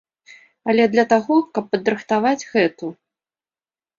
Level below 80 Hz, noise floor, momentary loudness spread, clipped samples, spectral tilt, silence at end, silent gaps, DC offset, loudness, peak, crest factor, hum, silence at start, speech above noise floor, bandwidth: -64 dBFS; under -90 dBFS; 10 LU; under 0.1%; -5.5 dB/octave; 1.05 s; none; under 0.1%; -19 LUFS; -2 dBFS; 18 dB; none; 0.65 s; over 72 dB; 7.4 kHz